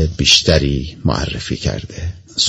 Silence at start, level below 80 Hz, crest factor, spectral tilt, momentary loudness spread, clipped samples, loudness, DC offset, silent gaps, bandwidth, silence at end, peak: 0 s; -28 dBFS; 16 dB; -3.5 dB/octave; 15 LU; under 0.1%; -15 LUFS; under 0.1%; none; 11.5 kHz; 0 s; 0 dBFS